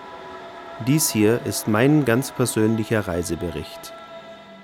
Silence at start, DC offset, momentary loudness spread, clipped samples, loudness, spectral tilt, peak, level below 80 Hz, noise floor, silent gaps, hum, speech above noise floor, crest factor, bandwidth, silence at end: 0 s; under 0.1%; 20 LU; under 0.1%; -21 LUFS; -5 dB/octave; -6 dBFS; -54 dBFS; -41 dBFS; none; none; 20 dB; 16 dB; 18.5 kHz; 0 s